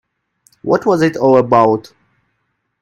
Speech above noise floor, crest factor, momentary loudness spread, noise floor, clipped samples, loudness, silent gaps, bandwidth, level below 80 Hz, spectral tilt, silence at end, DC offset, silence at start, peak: 56 dB; 16 dB; 9 LU; -69 dBFS; under 0.1%; -13 LUFS; none; 12.5 kHz; -56 dBFS; -7 dB/octave; 1 s; under 0.1%; 0.65 s; 0 dBFS